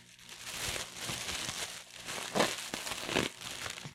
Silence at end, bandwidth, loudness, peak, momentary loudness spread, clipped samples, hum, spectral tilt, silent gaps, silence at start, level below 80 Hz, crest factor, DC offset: 0 s; 16.5 kHz; -36 LUFS; -14 dBFS; 10 LU; under 0.1%; 60 Hz at -65 dBFS; -2 dB/octave; none; 0 s; -60 dBFS; 24 dB; under 0.1%